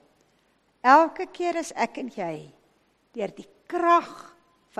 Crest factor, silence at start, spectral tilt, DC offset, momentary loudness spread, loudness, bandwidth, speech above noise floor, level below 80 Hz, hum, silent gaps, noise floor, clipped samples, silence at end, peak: 24 dB; 0.85 s; -4.5 dB/octave; under 0.1%; 21 LU; -24 LUFS; 13 kHz; 42 dB; -72 dBFS; none; none; -66 dBFS; under 0.1%; 0.6 s; -2 dBFS